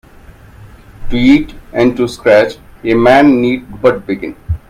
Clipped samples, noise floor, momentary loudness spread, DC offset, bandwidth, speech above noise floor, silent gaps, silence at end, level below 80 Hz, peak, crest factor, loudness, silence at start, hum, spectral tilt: under 0.1%; -38 dBFS; 13 LU; under 0.1%; 14.5 kHz; 27 dB; none; 0.15 s; -30 dBFS; 0 dBFS; 12 dB; -12 LUFS; 0.6 s; none; -6.5 dB/octave